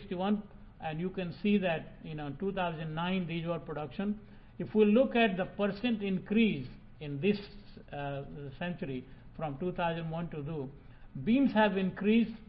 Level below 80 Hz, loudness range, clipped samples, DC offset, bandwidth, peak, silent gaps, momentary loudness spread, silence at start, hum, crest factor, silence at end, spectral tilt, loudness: -54 dBFS; 8 LU; under 0.1%; under 0.1%; 5.4 kHz; -14 dBFS; none; 16 LU; 0 s; none; 18 dB; 0.05 s; -10.5 dB/octave; -33 LUFS